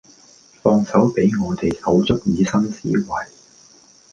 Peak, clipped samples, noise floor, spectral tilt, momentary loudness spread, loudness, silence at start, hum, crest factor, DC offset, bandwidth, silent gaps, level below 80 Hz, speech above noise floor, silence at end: -2 dBFS; under 0.1%; -50 dBFS; -6.5 dB/octave; 7 LU; -19 LUFS; 0.65 s; none; 18 dB; under 0.1%; 7.6 kHz; none; -44 dBFS; 31 dB; 0.85 s